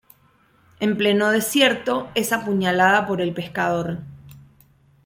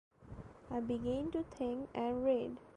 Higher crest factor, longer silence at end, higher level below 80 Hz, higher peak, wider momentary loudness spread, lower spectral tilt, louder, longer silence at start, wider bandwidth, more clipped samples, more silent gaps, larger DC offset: about the same, 20 dB vs 16 dB; first, 0.65 s vs 0.05 s; about the same, -60 dBFS vs -60 dBFS; first, -2 dBFS vs -22 dBFS; second, 9 LU vs 19 LU; second, -4 dB/octave vs -8 dB/octave; first, -20 LUFS vs -38 LUFS; first, 0.8 s vs 0.2 s; first, 16.5 kHz vs 10 kHz; neither; neither; neither